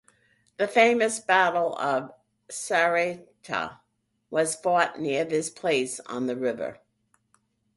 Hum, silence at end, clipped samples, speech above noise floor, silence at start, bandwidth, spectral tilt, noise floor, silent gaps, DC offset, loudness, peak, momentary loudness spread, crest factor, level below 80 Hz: none; 1.05 s; under 0.1%; 49 dB; 0.6 s; 11.5 kHz; -3 dB/octave; -74 dBFS; none; under 0.1%; -25 LUFS; -6 dBFS; 14 LU; 20 dB; -72 dBFS